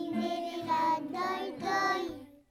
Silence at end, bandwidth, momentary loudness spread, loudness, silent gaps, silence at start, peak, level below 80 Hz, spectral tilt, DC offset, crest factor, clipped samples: 0.2 s; 17.5 kHz; 7 LU; -32 LUFS; none; 0 s; -18 dBFS; -70 dBFS; -4 dB/octave; under 0.1%; 16 dB; under 0.1%